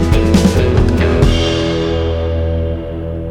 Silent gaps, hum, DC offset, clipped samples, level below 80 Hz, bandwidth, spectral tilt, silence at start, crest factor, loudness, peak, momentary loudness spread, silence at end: none; none; under 0.1%; under 0.1%; -18 dBFS; 13 kHz; -6.5 dB/octave; 0 s; 12 dB; -14 LUFS; 0 dBFS; 9 LU; 0 s